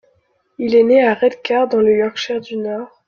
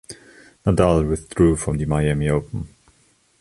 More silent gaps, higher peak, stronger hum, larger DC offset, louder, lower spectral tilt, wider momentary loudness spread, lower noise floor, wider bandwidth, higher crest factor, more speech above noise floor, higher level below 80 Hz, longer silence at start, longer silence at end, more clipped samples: neither; about the same, -2 dBFS vs -2 dBFS; neither; neither; first, -16 LUFS vs -20 LUFS; second, -5.5 dB/octave vs -7 dB/octave; second, 12 LU vs 18 LU; about the same, -61 dBFS vs -59 dBFS; second, 7 kHz vs 11.5 kHz; about the same, 14 dB vs 18 dB; first, 46 dB vs 41 dB; second, -60 dBFS vs -34 dBFS; first, 0.6 s vs 0.1 s; second, 0.2 s vs 0.75 s; neither